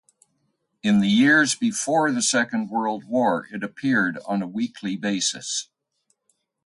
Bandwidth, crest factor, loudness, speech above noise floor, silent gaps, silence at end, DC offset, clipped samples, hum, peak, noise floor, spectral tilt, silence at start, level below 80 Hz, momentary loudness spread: 11.5 kHz; 16 dB; -22 LUFS; 50 dB; none; 1 s; under 0.1%; under 0.1%; none; -6 dBFS; -72 dBFS; -3.5 dB/octave; 0.85 s; -68 dBFS; 11 LU